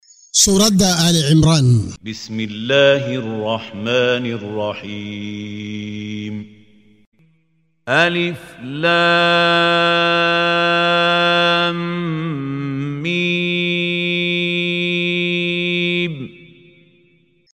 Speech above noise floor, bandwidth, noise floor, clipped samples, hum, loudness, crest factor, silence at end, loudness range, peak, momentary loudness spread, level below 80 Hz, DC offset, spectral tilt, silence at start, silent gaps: 46 dB; 16 kHz; -63 dBFS; under 0.1%; none; -16 LUFS; 18 dB; 1.1 s; 9 LU; 0 dBFS; 15 LU; -46 dBFS; under 0.1%; -4 dB/octave; 0.35 s; 7.06-7.12 s